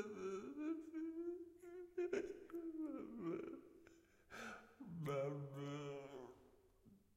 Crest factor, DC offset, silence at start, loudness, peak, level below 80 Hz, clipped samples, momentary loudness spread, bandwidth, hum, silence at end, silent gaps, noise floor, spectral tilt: 18 dB; under 0.1%; 0 s; -49 LUFS; -32 dBFS; -80 dBFS; under 0.1%; 14 LU; 16 kHz; none; 0.2 s; none; -70 dBFS; -7 dB/octave